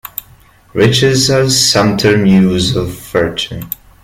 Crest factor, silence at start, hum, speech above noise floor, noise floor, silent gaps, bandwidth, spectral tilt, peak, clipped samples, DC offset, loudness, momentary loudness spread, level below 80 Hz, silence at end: 12 dB; 0.05 s; none; 33 dB; -44 dBFS; none; 16.5 kHz; -4.5 dB/octave; 0 dBFS; under 0.1%; under 0.1%; -11 LUFS; 14 LU; -38 dBFS; 0.35 s